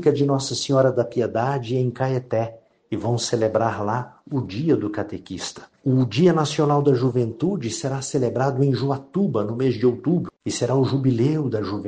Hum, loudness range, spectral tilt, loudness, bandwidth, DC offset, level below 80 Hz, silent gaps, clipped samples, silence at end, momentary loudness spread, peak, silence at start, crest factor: none; 3 LU; -6.5 dB/octave; -22 LUFS; 9.4 kHz; under 0.1%; -58 dBFS; none; under 0.1%; 0 s; 10 LU; -4 dBFS; 0 s; 16 dB